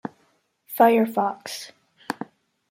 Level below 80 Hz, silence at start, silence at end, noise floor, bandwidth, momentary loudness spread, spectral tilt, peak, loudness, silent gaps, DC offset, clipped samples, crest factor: -78 dBFS; 0.05 s; 0.45 s; -66 dBFS; 16 kHz; 22 LU; -5 dB/octave; -4 dBFS; -22 LUFS; none; under 0.1%; under 0.1%; 20 dB